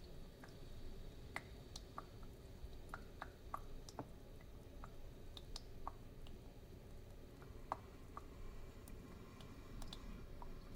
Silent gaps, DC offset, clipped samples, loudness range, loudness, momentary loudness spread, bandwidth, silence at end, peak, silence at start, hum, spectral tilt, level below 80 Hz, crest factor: none; under 0.1%; under 0.1%; 2 LU; -56 LUFS; 7 LU; 16 kHz; 0 s; -26 dBFS; 0 s; none; -5 dB/octave; -56 dBFS; 28 dB